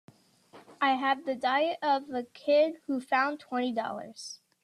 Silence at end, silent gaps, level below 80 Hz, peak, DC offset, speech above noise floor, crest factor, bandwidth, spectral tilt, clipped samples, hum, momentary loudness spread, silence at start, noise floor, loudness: 0.3 s; none; -82 dBFS; -12 dBFS; under 0.1%; 28 dB; 18 dB; 12 kHz; -3.5 dB/octave; under 0.1%; none; 13 LU; 0.55 s; -57 dBFS; -29 LUFS